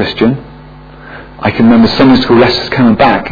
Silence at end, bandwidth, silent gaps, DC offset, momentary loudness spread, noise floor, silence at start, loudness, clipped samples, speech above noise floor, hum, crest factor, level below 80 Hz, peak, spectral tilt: 0 s; 5.4 kHz; none; under 0.1%; 10 LU; -32 dBFS; 0 s; -8 LUFS; 0.4%; 24 dB; none; 10 dB; -34 dBFS; 0 dBFS; -7.5 dB/octave